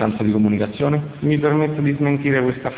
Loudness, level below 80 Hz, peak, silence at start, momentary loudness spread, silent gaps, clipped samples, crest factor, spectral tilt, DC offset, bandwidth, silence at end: -19 LUFS; -48 dBFS; -4 dBFS; 0 s; 3 LU; none; under 0.1%; 14 dB; -12 dB/octave; under 0.1%; 4 kHz; 0 s